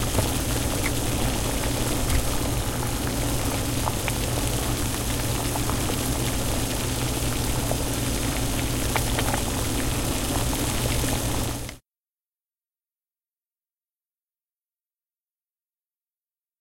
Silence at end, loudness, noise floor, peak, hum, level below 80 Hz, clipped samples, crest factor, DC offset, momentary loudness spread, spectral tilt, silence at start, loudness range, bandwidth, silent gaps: 4.8 s; -25 LUFS; under -90 dBFS; -6 dBFS; none; -32 dBFS; under 0.1%; 20 dB; under 0.1%; 2 LU; -4 dB/octave; 0 s; 4 LU; 17 kHz; none